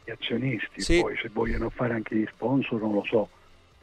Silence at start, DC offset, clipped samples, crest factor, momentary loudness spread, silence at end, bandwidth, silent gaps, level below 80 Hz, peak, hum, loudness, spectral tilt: 0.05 s; under 0.1%; under 0.1%; 16 dB; 6 LU; 0.55 s; 11 kHz; none; -40 dBFS; -12 dBFS; none; -28 LUFS; -5.5 dB/octave